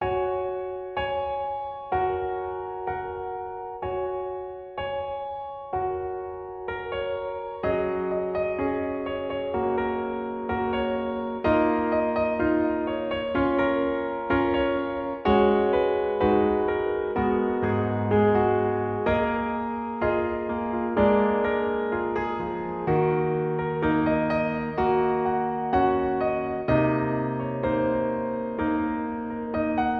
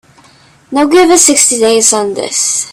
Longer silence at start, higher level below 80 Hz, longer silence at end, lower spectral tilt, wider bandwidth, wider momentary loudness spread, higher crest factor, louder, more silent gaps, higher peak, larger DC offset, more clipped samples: second, 0 s vs 0.7 s; about the same, -46 dBFS vs -50 dBFS; about the same, 0 s vs 0 s; first, -9.5 dB/octave vs -1 dB/octave; second, 5.4 kHz vs over 20 kHz; about the same, 10 LU vs 9 LU; first, 18 dB vs 10 dB; second, -26 LUFS vs -8 LUFS; neither; second, -8 dBFS vs 0 dBFS; neither; second, under 0.1% vs 0.4%